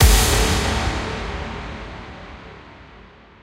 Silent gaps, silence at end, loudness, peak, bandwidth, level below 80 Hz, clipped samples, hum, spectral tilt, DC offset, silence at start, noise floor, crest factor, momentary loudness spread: none; 0.4 s; -21 LUFS; -2 dBFS; 16 kHz; -24 dBFS; under 0.1%; none; -3.5 dB/octave; under 0.1%; 0 s; -45 dBFS; 20 dB; 24 LU